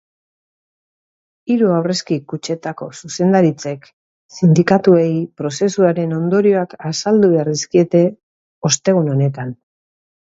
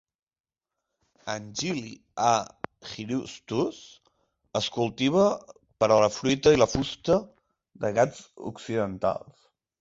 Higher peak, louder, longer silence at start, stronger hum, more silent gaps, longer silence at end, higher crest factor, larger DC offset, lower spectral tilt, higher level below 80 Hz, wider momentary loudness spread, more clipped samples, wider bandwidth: first, 0 dBFS vs -6 dBFS; first, -16 LUFS vs -26 LUFS; first, 1.45 s vs 1.25 s; neither; first, 3.93-4.29 s, 8.23-8.61 s vs none; about the same, 0.7 s vs 0.65 s; second, 16 dB vs 22 dB; neither; about the same, -6 dB/octave vs -5 dB/octave; second, -60 dBFS vs -54 dBFS; second, 14 LU vs 17 LU; neither; about the same, 8 kHz vs 8 kHz